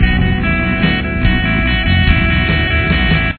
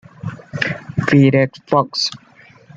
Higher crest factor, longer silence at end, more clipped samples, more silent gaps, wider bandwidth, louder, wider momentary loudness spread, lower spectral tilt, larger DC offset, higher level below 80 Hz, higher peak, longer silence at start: second, 12 dB vs 18 dB; second, 0 s vs 0.6 s; neither; neither; second, 4.5 kHz vs 7.8 kHz; first, -13 LUFS vs -17 LUFS; second, 3 LU vs 16 LU; first, -9.5 dB/octave vs -6 dB/octave; neither; first, -18 dBFS vs -52 dBFS; about the same, 0 dBFS vs 0 dBFS; second, 0 s vs 0.25 s